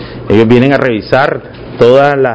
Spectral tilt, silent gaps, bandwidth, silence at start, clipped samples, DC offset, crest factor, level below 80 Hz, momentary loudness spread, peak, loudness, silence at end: -8 dB/octave; none; 8 kHz; 0 s; 3%; under 0.1%; 8 dB; -36 dBFS; 8 LU; 0 dBFS; -9 LUFS; 0 s